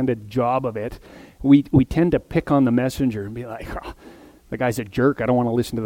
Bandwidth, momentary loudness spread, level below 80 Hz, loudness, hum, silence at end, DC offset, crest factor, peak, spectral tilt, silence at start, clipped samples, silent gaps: 16.5 kHz; 16 LU; -42 dBFS; -20 LUFS; none; 0 s; under 0.1%; 20 dB; -2 dBFS; -7.5 dB/octave; 0 s; under 0.1%; none